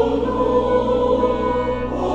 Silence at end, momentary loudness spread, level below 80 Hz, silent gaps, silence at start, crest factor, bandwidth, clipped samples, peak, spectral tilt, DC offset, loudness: 0 s; 4 LU; -34 dBFS; none; 0 s; 12 dB; 8 kHz; under 0.1%; -6 dBFS; -7.5 dB/octave; under 0.1%; -19 LUFS